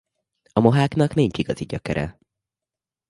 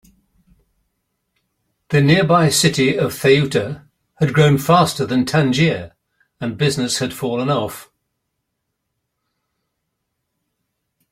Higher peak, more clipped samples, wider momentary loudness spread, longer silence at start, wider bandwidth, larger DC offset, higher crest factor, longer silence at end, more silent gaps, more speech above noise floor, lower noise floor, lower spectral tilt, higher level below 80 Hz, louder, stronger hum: about the same, 0 dBFS vs -2 dBFS; neither; second, 10 LU vs 14 LU; second, 0.55 s vs 1.9 s; second, 11.5 kHz vs 16 kHz; neither; about the same, 22 dB vs 18 dB; second, 1 s vs 3.3 s; neither; first, 69 dB vs 60 dB; first, -89 dBFS vs -76 dBFS; first, -7.5 dB/octave vs -5 dB/octave; about the same, -48 dBFS vs -52 dBFS; second, -21 LUFS vs -16 LUFS; neither